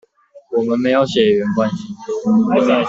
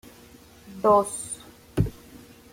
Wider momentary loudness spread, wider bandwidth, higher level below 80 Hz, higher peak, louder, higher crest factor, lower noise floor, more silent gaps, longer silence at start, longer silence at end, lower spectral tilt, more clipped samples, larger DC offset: second, 9 LU vs 17 LU; second, 7.6 kHz vs 16.5 kHz; second, -56 dBFS vs -46 dBFS; first, -2 dBFS vs -8 dBFS; first, -16 LUFS vs -25 LUFS; second, 14 dB vs 20 dB; second, -44 dBFS vs -50 dBFS; neither; second, 0.35 s vs 0.65 s; second, 0 s vs 0.35 s; about the same, -6.5 dB/octave vs -6 dB/octave; neither; neither